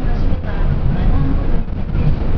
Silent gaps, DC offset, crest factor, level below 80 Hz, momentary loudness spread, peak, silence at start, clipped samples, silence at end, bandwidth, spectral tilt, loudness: none; under 0.1%; 12 dB; -16 dBFS; 5 LU; -2 dBFS; 0 s; under 0.1%; 0 s; 5.4 kHz; -10 dB/octave; -20 LUFS